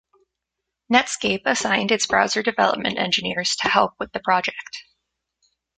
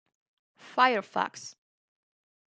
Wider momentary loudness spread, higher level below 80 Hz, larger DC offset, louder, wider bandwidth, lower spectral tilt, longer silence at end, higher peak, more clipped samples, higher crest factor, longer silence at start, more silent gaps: second, 8 LU vs 20 LU; first, -58 dBFS vs -88 dBFS; neither; first, -20 LUFS vs -27 LUFS; about the same, 9.6 kHz vs 9.2 kHz; about the same, -2.5 dB/octave vs -3 dB/octave; about the same, 0.95 s vs 1 s; first, -2 dBFS vs -8 dBFS; neither; about the same, 22 dB vs 24 dB; first, 0.9 s vs 0.65 s; neither